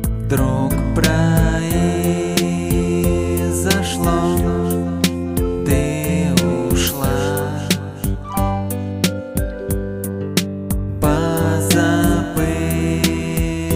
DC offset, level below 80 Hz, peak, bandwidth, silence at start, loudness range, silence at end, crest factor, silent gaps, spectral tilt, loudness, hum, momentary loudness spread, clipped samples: under 0.1%; -28 dBFS; 0 dBFS; 16.5 kHz; 0 s; 4 LU; 0 s; 18 dB; none; -5.5 dB/octave; -18 LUFS; none; 7 LU; under 0.1%